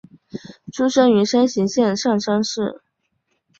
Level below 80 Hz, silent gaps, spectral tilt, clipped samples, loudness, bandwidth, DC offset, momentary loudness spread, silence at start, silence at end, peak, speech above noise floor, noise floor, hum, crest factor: -62 dBFS; none; -5 dB/octave; under 0.1%; -18 LUFS; 8 kHz; under 0.1%; 21 LU; 0.35 s; 0.85 s; -4 dBFS; 53 dB; -70 dBFS; none; 16 dB